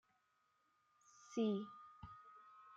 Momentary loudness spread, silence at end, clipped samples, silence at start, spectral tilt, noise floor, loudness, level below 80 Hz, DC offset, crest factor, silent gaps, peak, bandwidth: 21 LU; 0 s; under 0.1%; 1.25 s; -6.5 dB/octave; -81 dBFS; -43 LUFS; -78 dBFS; under 0.1%; 18 dB; none; -30 dBFS; 7.8 kHz